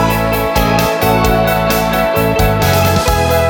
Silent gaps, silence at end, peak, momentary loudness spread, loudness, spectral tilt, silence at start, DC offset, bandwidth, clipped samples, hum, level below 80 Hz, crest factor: none; 0 s; 0 dBFS; 2 LU; -12 LUFS; -5 dB/octave; 0 s; under 0.1%; 18 kHz; under 0.1%; none; -24 dBFS; 12 dB